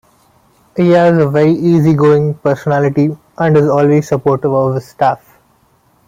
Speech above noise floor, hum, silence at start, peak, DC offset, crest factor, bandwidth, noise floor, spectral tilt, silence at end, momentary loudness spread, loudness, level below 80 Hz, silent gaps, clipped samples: 42 dB; none; 0.75 s; -2 dBFS; under 0.1%; 12 dB; 15 kHz; -53 dBFS; -8.5 dB/octave; 0.9 s; 7 LU; -12 LUFS; -50 dBFS; none; under 0.1%